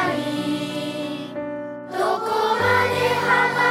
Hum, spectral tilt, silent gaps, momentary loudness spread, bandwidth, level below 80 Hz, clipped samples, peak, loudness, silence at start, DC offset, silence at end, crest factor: none; -4.5 dB/octave; none; 12 LU; 16.5 kHz; -62 dBFS; under 0.1%; -6 dBFS; -22 LUFS; 0 s; under 0.1%; 0 s; 16 dB